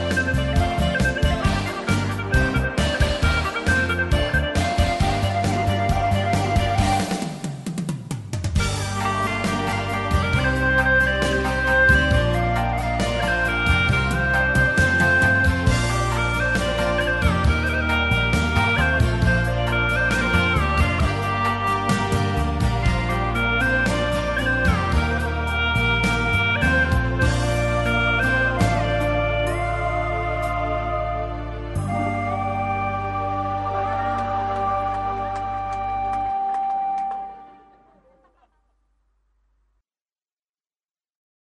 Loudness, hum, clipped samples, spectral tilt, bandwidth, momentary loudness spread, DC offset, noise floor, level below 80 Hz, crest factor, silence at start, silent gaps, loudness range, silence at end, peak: -21 LUFS; none; under 0.1%; -5.5 dB/octave; 12.5 kHz; 7 LU; under 0.1%; under -90 dBFS; -28 dBFS; 18 dB; 0 s; none; 6 LU; 4.05 s; -4 dBFS